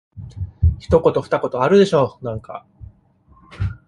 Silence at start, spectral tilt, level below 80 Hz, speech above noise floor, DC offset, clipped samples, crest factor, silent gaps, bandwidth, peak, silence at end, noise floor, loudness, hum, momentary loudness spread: 0.15 s; -7.5 dB/octave; -30 dBFS; 36 dB; under 0.1%; under 0.1%; 18 dB; none; 11 kHz; -2 dBFS; 0.1 s; -53 dBFS; -18 LUFS; none; 19 LU